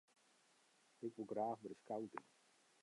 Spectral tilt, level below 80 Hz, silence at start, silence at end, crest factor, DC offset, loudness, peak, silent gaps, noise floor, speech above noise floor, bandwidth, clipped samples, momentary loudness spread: -6.5 dB/octave; under -90 dBFS; 1 s; 0.6 s; 20 dB; under 0.1%; -48 LUFS; -30 dBFS; none; -75 dBFS; 28 dB; 11 kHz; under 0.1%; 9 LU